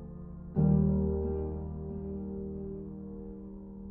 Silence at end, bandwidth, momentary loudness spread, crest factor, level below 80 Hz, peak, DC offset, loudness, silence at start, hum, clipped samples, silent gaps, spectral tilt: 0 s; 1.8 kHz; 18 LU; 16 dB; -42 dBFS; -16 dBFS; under 0.1%; -33 LUFS; 0 s; none; under 0.1%; none; -15 dB/octave